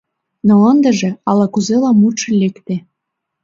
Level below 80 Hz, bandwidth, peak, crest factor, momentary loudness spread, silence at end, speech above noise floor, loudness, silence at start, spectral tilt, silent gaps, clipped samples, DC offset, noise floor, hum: -58 dBFS; 7.6 kHz; 0 dBFS; 14 dB; 11 LU; 0.65 s; 64 dB; -13 LUFS; 0.45 s; -6 dB/octave; none; under 0.1%; under 0.1%; -76 dBFS; none